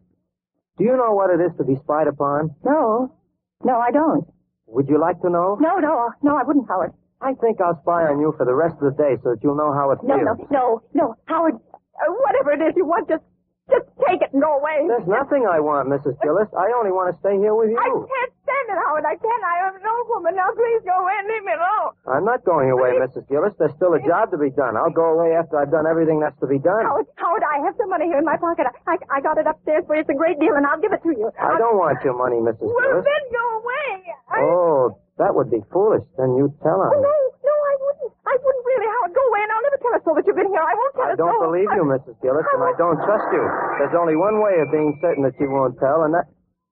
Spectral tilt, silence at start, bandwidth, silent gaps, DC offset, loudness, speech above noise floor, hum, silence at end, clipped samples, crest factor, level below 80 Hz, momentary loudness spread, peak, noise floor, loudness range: -6 dB/octave; 0.8 s; 3.8 kHz; none; under 0.1%; -19 LUFS; 59 dB; none; 0.45 s; under 0.1%; 16 dB; -60 dBFS; 5 LU; -4 dBFS; -78 dBFS; 2 LU